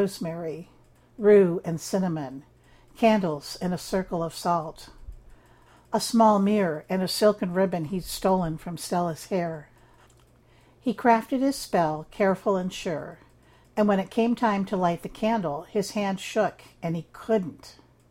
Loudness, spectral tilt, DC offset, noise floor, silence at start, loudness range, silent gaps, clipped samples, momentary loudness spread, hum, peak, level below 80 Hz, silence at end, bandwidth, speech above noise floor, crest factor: -26 LUFS; -6 dB/octave; under 0.1%; -57 dBFS; 0 s; 4 LU; none; under 0.1%; 13 LU; none; -6 dBFS; -54 dBFS; 0.4 s; 16.5 kHz; 32 dB; 20 dB